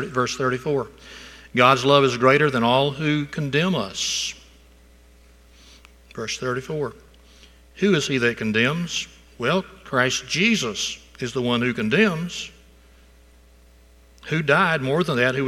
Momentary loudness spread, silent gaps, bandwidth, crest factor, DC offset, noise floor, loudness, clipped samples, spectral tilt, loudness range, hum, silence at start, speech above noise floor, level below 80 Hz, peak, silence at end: 15 LU; none; 14.5 kHz; 22 dB; under 0.1%; -51 dBFS; -21 LUFS; under 0.1%; -4.5 dB/octave; 9 LU; none; 0 s; 30 dB; -52 dBFS; 0 dBFS; 0 s